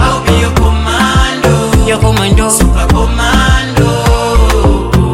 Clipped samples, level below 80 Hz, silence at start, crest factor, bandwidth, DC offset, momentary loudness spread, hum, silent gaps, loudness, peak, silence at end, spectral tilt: under 0.1%; -12 dBFS; 0 s; 8 dB; 16.5 kHz; under 0.1%; 2 LU; none; none; -10 LUFS; 0 dBFS; 0 s; -5 dB/octave